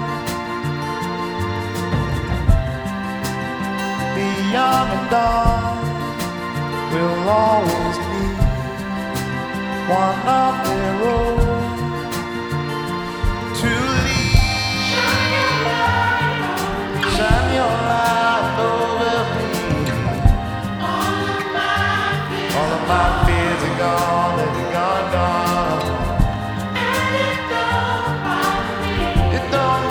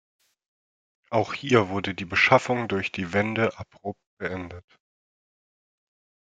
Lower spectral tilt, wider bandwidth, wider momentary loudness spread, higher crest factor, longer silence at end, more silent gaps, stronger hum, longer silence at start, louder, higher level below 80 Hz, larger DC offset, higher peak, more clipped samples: about the same, -5 dB/octave vs -5.5 dB/octave; first, over 20 kHz vs 9.2 kHz; second, 8 LU vs 18 LU; second, 18 dB vs 26 dB; second, 0 s vs 1.7 s; second, none vs 4.07-4.17 s; neither; second, 0 s vs 1.1 s; first, -19 LUFS vs -24 LUFS; first, -28 dBFS vs -64 dBFS; neither; about the same, -2 dBFS vs -2 dBFS; neither